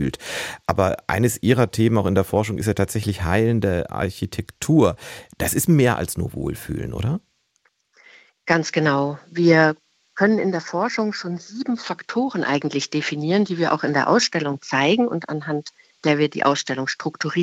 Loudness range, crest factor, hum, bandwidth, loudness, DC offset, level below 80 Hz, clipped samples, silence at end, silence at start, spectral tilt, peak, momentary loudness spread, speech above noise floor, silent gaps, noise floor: 3 LU; 20 dB; none; 16 kHz; -21 LUFS; under 0.1%; -46 dBFS; under 0.1%; 0 s; 0 s; -5.5 dB/octave; -2 dBFS; 11 LU; 46 dB; none; -66 dBFS